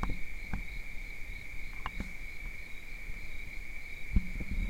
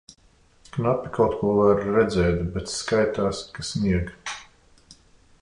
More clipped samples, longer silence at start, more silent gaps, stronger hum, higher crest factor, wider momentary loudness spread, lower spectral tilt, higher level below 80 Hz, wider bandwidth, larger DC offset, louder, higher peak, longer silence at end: neither; second, 0 s vs 0.75 s; neither; neither; about the same, 22 dB vs 18 dB; second, 8 LU vs 13 LU; about the same, -5.5 dB/octave vs -6 dB/octave; about the same, -38 dBFS vs -42 dBFS; first, 16 kHz vs 11 kHz; neither; second, -42 LUFS vs -23 LUFS; second, -14 dBFS vs -8 dBFS; second, 0 s vs 0.5 s